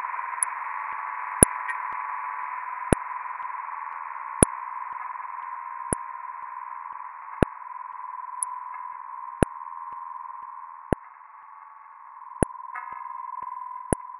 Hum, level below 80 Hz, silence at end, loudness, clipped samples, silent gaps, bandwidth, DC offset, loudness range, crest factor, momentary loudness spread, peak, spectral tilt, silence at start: none; -42 dBFS; 0 s; -29 LUFS; under 0.1%; none; 11 kHz; under 0.1%; 8 LU; 30 dB; 17 LU; 0 dBFS; -4.5 dB/octave; 0 s